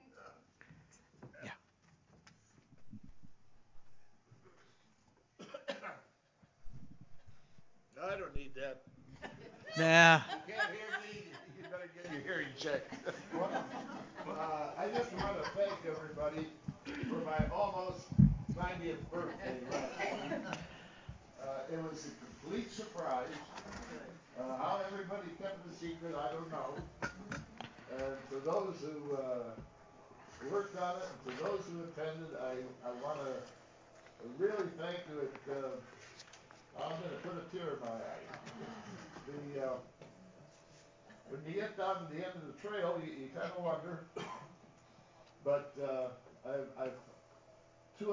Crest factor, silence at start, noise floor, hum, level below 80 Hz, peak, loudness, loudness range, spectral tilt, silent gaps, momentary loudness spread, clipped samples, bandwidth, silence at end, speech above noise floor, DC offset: 32 dB; 0.15 s; -71 dBFS; none; -58 dBFS; -8 dBFS; -39 LUFS; 17 LU; -5.5 dB/octave; none; 17 LU; under 0.1%; 7.6 kHz; 0 s; 33 dB; under 0.1%